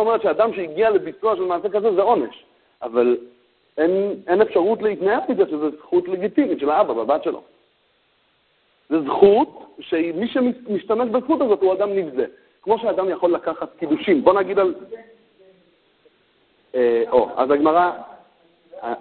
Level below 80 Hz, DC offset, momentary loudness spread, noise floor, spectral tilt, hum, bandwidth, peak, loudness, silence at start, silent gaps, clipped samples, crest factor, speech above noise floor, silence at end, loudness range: -60 dBFS; under 0.1%; 12 LU; -63 dBFS; -10.5 dB/octave; none; 4.4 kHz; 0 dBFS; -20 LUFS; 0 s; none; under 0.1%; 20 dB; 44 dB; 0 s; 3 LU